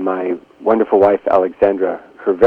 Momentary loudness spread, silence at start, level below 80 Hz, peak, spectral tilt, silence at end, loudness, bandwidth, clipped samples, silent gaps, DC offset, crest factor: 9 LU; 0 s; -54 dBFS; 0 dBFS; -8.5 dB/octave; 0 s; -16 LUFS; 5 kHz; under 0.1%; none; under 0.1%; 14 dB